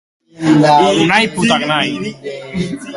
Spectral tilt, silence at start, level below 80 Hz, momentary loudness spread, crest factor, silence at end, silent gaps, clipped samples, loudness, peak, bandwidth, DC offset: -5 dB/octave; 0.4 s; -48 dBFS; 14 LU; 14 dB; 0 s; none; under 0.1%; -13 LUFS; 0 dBFS; 11.5 kHz; under 0.1%